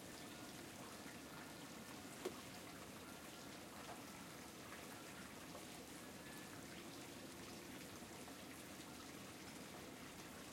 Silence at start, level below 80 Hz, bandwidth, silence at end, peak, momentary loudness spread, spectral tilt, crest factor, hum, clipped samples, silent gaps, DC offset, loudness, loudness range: 0 s; -76 dBFS; 16.5 kHz; 0 s; -34 dBFS; 1 LU; -3 dB/octave; 22 dB; none; under 0.1%; none; under 0.1%; -54 LUFS; 1 LU